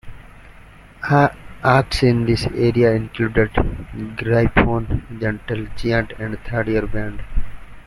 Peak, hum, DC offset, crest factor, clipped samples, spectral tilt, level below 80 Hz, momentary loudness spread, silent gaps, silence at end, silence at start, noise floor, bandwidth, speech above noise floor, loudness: -2 dBFS; none; under 0.1%; 18 dB; under 0.1%; -7 dB/octave; -30 dBFS; 13 LU; none; 0.05 s; 0.05 s; -43 dBFS; 12 kHz; 25 dB; -19 LUFS